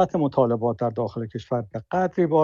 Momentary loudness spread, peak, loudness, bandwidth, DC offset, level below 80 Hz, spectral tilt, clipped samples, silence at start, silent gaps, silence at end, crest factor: 7 LU; -6 dBFS; -24 LUFS; 7.2 kHz; under 0.1%; -58 dBFS; -9 dB/octave; under 0.1%; 0 s; none; 0 s; 16 dB